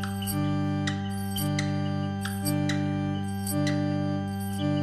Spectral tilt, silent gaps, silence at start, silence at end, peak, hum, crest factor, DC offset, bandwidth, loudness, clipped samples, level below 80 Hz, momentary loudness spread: -5.5 dB/octave; none; 0 s; 0 s; -14 dBFS; 50 Hz at -50 dBFS; 14 dB; 0.1%; 15.5 kHz; -29 LUFS; under 0.1%; -56 dBFS; 4 LU